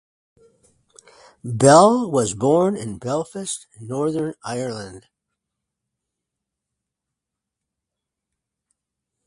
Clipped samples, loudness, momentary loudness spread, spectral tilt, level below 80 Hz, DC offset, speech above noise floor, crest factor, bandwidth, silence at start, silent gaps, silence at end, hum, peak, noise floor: under 0.1%; -19 LUFS; 18 LU; -5.5 dB/octave; -58 dBFS; under 0.1%; 65 dB; 24 dB; 11.5 kHz; 1.45 s; none; 4.3 s; none; 0 dBFS; -84 dBFS